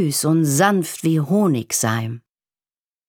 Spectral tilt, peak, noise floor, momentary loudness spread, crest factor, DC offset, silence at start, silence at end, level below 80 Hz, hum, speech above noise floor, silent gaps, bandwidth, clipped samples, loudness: -5 dB/octave; -2 dBFS; under -90 dBFS; 9 LU; 18 dB; under 0.1%; 0 s; 0.9 s; -68 dBFS; none; over 72 dB; none; 19.5 kHz; under 0.1%; -18 LUFS